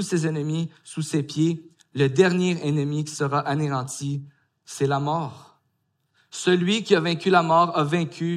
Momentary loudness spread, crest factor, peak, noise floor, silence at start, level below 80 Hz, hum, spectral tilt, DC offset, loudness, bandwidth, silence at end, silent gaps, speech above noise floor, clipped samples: 13 LU; 20 dB; -4 dBFS; -72 dBFS; 0 s; -70 dBFS; none; -5.5 dB/octave; under 0.1%; -23 LUFS; 13 kHz; 0 s; none; 49 dB; under 0.1%